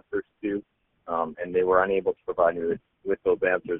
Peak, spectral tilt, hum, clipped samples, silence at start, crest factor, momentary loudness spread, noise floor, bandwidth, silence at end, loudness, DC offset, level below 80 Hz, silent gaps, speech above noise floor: -8 dBFS; -4.5 dB/octave; none; under 0.1%; 0.1 s; 18 dB; 10 LU; -50 dBFS; 3.8 kHz; 0 s; -26 LUFS; under 0.1%; -58 dBFS; none; 25 dB